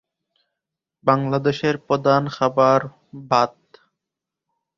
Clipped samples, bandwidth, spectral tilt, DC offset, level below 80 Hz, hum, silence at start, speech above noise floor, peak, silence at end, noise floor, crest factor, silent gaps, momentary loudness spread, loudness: under 0.1%; 7.6 kHz; -6.5 dB/octave; under 0.1%; -62 dBFS; none; 1.05 s; 66 dB; -2 dBFS; 1.3 s; -85 dBFS; 20 dB; none; 7 LU; -20 LUFS